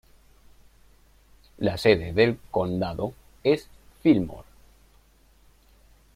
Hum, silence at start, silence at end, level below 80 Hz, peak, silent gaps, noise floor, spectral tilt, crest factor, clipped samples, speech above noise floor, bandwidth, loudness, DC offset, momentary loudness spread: none; 1.6 s; 1.75 s; -52 dBFS; -4 dBFS; none; -58 dBFS; -7 dB/octave; 22 dB; under 0.1%; 35 dB; 15.5 kHz; -25 LUFS; under 0.1%; 12 LU